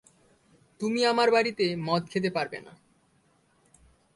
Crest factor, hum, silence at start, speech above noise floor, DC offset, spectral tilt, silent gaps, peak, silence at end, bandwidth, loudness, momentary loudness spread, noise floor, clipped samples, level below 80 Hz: 20 dB; none; 0.8 s; 40 dB; under 0.1%; -5 dB/octave; none; -10 dBFS; 1.45 s; 11.5 kHz; -26 LUFS; 12 LU; -66 dBFS; under 0.1%; -70 dBFS